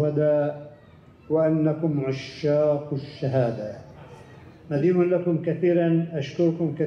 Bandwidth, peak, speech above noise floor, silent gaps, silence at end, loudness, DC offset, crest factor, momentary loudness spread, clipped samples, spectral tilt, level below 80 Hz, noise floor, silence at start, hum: 6.8 kHz; -10 dBFS; 23 dB; none; 0 s; -24 LUFS; under 0.1%; 14 dB; 9 LU; under 0.1%; -9 dB/octave; -64 dBFS; -46 dBFS; 0 s; none